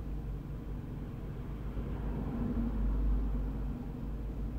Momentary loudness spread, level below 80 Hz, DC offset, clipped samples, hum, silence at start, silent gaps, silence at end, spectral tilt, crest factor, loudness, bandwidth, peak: 8 LU; -38 dBFS; under 0.1%; under 0.1%; none; 0 s; none; 0 s; -9.5 dB/octave; 12 dB; -39 LUFS; 4.2 kHz; -22 dBFS